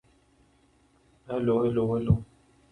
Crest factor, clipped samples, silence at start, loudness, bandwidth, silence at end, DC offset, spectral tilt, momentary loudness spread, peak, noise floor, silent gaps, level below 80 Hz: 20 dB; under 0.1%; 1.3 s; -27 LUFS; 9.2 kHz; 0.5 s; under 0.1%; -10 dB/octave; 5 LU; -10 dBFS; -64 dBFS; none; -46 dBFS